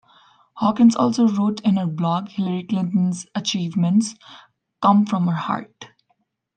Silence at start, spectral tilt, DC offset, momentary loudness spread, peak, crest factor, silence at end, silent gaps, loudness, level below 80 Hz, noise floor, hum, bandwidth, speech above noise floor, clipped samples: 0.55 s; -6.5 dB/octave; under 0.1%; 9 LU; -2 dBFS; 18 dB; 0.7 s; none; -20 LUFS; -68 dBFS; -69 dBFS; none; 9.2 kHz; 49 dB; under 0.1%